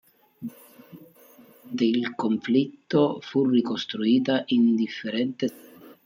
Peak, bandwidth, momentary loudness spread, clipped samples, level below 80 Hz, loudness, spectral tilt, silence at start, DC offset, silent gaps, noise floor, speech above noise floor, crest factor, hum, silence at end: -10 dBFS; 16 kHz; 13 LU; under 0.1%; -74 dBFS; -24 LUFS; -6.5 dB/octave; 0.4 s; under 0.1%; none; -53 dBFS; 29 dB; 16 dB; none; 0.15 s